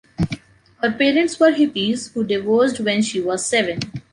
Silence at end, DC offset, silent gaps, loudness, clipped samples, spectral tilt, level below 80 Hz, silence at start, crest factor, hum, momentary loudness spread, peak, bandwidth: 0.15 s; under 0.1%; none; -19 LUFS; under 0.1%; -4.5 dB/octave; -48 dBFS; 0.2 s; 16 dB; none; 10 LU; -2 dBFS; 11 kHz